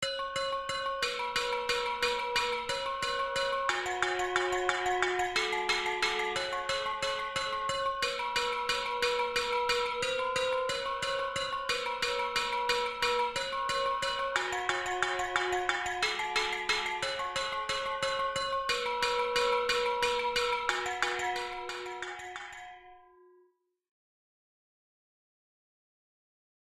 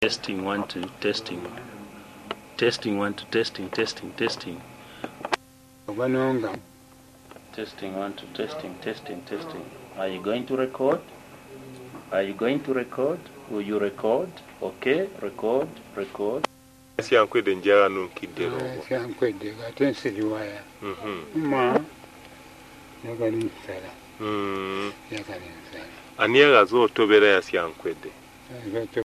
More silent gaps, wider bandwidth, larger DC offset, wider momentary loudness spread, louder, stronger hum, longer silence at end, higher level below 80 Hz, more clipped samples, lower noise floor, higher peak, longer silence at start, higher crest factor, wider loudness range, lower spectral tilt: neither; about the same, 15 kHz vs 14 kHz; neither; second, 4 LU vs 21 LU; second, -31 LUFS vs -25 LUFS; neither; first, 3.7 s vs 0 s; about the same, -58 dBFS vs -62 dBFS; neither; first, -70 dBFS vs -52 dBFS; second, -12 dBFS vs -2 dBFS; about the same, 0 s vs 0 s; about the same, 22 dB vs 24 dB; second, 4 LU vs 11 LU; second, -1.5 dB/octave vs -5 dB/octave